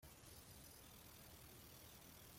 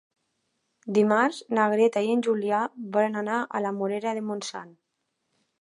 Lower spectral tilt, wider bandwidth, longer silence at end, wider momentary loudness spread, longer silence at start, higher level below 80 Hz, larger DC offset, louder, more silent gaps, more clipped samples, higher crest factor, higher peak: second, -3 dB/octave vs -5.5 dB/octave; first, 16.5 kHz vs 11.5 kHz; second, 0 s vs 0.9 s; second, 1 LU vs 10 LU; second, 0 s vs 0.85 s; first, -72 dBFS vs -80 dBFS; neither; second, -60 LUFS vs -25 LUFS; neither; neither; about the same, 14 dB vs 18 dB; second, -48 dBFS vs -8 dBFS